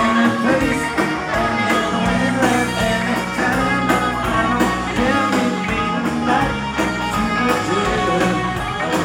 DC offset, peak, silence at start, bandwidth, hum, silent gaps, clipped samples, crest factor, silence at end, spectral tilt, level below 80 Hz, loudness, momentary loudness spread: under 0.1%; -2 dBFS; 0 s; 17.5 kHz; none; none; under 0.1%; 16 dB; 0 s; -5 dB/octave; -36 dBFS; -18 LUFS; 3 LU